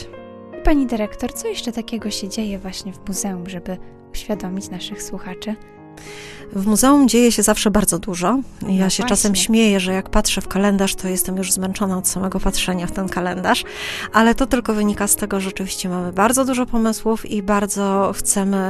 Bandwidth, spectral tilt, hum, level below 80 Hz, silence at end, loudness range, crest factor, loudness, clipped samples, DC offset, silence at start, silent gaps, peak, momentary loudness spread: 13 kHz; -4 dB/octave; none; -34 dBFS; 0 s; 11 LU; 18 dB; -19 LUFS; under 0.1%; under 0.1%; 0 s; none; 0 dBFS; 15 LU